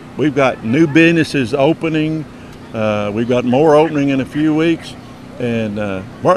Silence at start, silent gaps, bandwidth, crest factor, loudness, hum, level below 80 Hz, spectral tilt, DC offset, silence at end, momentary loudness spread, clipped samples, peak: 0 s; none; 11.5 kHz; 14 dB; -15 LUFS; none; -46 dBFS; -6.5 dB/octave; under 0.1%; 0 s; 14 LU; under 0.1%; 0 dBFS